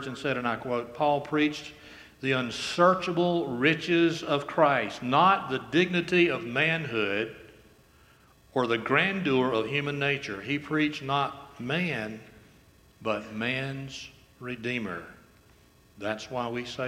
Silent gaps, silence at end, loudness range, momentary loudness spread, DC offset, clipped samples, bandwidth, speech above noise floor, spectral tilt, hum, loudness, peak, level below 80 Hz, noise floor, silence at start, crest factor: none; 0 s; 10 LU; 14 LU; under 0.1%; under 0.1%; 14.5 kHz; 31 dB; -5.5 dB/octave; none; -27 LUFS; -8 dBFS; -64 dBFS; -59 dBFS; 0 s; 22 dB